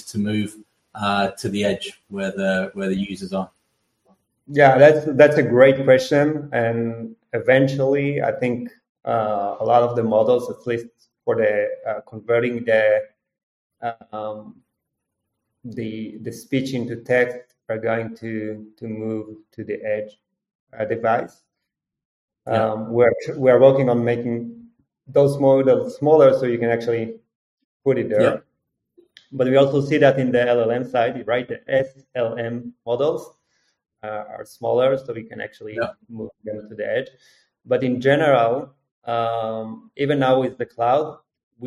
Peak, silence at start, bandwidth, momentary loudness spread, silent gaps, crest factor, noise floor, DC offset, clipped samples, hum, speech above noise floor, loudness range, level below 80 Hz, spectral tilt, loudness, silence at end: 0 dBFS; 0.05 s; 12 kHz; 18 LU; 8.89-8.95 s, 13.43-13.70 s, 20.55-20.67 s, 22.05-22.28 s, 27.35-27.58 s, 27.64-27.80 s, 38.91-39.02 s, 41.43-41.51 s; 20 dB; -82 dBFS; under 0.1%; under 0.1%; none; 62 dB; 10 LU; -62 dBFS; -7 dB/octave; -20 LUFS; 0 s